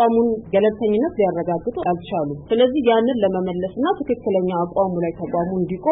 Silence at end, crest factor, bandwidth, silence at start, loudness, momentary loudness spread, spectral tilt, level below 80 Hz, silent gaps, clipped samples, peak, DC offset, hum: 0 s; 14 dB; 4 kHz; 0 s; -20 LUFS; 7 LU; -12 dB/octave; -50 dBFS; none; under 0.1%; -6 dBFS; under 0.1%; none